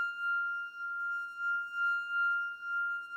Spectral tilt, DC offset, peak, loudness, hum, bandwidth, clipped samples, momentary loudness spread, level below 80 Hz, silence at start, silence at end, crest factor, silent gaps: 1 dB/octave; under 0.1%; -26 dBFS; -33 LUFS; none; 12 kHz; under 0.1%; 6 LU; under -90 dBFS; 0 s; 0 s; 10 dB; none